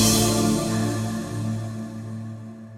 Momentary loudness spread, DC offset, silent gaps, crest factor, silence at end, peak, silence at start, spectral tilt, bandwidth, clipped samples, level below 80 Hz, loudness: 15 LU; under 0.1%; none; 18 dB; 0 s; -6 dBFS; 0 s; -4.5 dB/octave; 16 kHz; under 0.1%; -44 dBFS; -24 LUFS